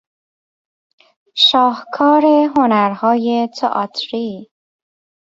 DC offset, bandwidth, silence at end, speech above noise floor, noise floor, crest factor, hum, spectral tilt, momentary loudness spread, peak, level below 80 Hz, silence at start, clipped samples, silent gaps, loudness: under 0.1%; 7.8 kHz; 0.95 s; over 76 dB; under -90 dBFS; 16 dB; none; -5 dB/octave; 13 LU; -2 dBFS; -64 dBFS; 1.35 s; under 0.1%; none; -14 LUFS